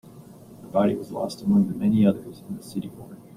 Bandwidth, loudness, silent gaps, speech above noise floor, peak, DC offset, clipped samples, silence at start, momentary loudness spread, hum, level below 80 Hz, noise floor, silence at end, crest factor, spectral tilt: 14.5 kHz; -24 LUFS; none; 22 dB; -8 dBFS; under 0.1%; under 0.1%; 0.05 s; 17 LU; none; -60 dBFS; -46 dBFS; 0.2 s; 18 dB; -8 dB/octave